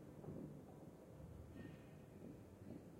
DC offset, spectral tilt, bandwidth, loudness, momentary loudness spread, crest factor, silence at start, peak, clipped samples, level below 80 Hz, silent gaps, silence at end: under 0.1%; -7.5 dB/octave; 16 kHz; -58 LUFS; 6 LU; 16 dB; 0 s; -40 dBFS; under 0.1%; -72 dBFS; none; 0 s